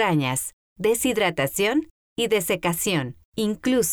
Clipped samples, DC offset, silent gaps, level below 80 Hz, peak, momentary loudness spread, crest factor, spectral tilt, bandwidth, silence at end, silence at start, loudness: under 0.1%; under 0.1%; 0.53-0.76 s, 1.91-2.16 s, 3.25-3.32 s; -54 dBFS; -10 dBFS; 7 LU; 14 dB; -4 dB/octave; over 20 kHz; 0 s; 0 s; -23 LUFS